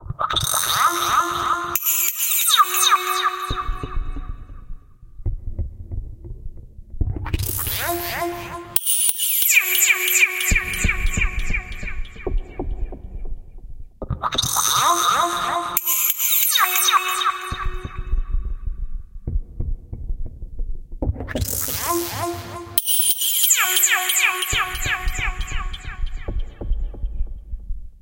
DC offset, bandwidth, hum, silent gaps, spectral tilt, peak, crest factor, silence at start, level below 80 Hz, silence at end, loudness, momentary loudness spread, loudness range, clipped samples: under 0.1%; 17.5 kHz; none; none; -1.5 dB/octave; 0 dBFS; 22 dB; 0 s; -28 dBFS; 0 s; -19 LUFS; 20 LU; 14 LU; under 0.1%